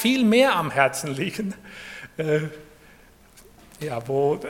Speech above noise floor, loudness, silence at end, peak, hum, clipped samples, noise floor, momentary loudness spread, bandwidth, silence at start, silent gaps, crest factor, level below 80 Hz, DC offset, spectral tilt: 29 dB; -23 LUFS; 0 s; -4 dBFS; none; under 0.1%; -52 dBFS; 19 LU; 17 kHz; 0 s; none; 22 dB; -58 dBFS; under 0.1%; -5 dB/octave